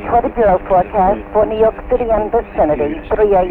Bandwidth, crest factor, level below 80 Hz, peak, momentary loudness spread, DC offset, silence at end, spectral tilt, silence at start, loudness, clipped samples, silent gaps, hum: 4.1 kHz; 12 dB; -30 dBFS; -2 dBFS; 5 LU; under 0.1%; 0 s; -9.5 dB/octave; 0 s; -15 LUFS; under 0.1%; none; none